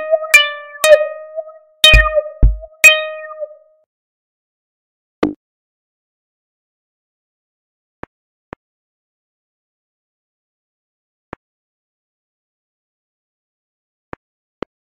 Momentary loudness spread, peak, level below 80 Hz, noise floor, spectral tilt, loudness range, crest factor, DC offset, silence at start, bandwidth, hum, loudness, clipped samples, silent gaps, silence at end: 23 LU; 0 dBFS; -28 dBFS; -32 dBFS; -2.5 dB/octave; 19 LU; 20 dB; under 0.1%; 0 s; 16 kHz; none; -11 LUFS; 0.2%; 3.86-5.22 s; 9.6 s